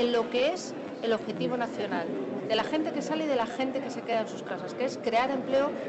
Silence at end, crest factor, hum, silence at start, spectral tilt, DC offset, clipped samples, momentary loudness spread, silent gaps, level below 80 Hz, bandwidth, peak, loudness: 0 s; 12 dB; none; 0 s; -4.5 dB/octave; under 0.1%; under 0.1%; 7 LU; none; -68 dBFS; 8.4 kHz; -18 dBFS; -30 LUFS